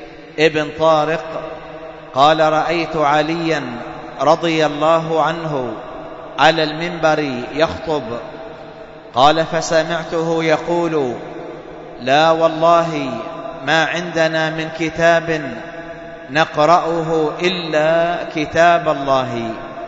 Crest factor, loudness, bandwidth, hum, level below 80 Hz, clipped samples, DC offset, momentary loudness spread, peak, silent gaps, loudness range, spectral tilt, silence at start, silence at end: 18 dB; -16 LUFS; 7.8 kHz; none; -48 dBFS; under 0.1%; under 0.1%; 17 LU; 0 dBFS; none; 3 LU; -5 dB/octave; 0 s; 0 s